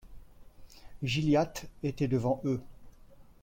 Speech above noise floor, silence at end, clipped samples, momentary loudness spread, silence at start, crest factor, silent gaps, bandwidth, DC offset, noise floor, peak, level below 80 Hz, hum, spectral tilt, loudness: 24 dB; 0.2 s; under 0.1%; 10 LU; 0.05 s; 16 dB; none; 16.5 kHz; under 0.1%; -54 dBFS; -16 dBFS; -54 dBFS; none; -6.5 dB/octave; -31 LUFS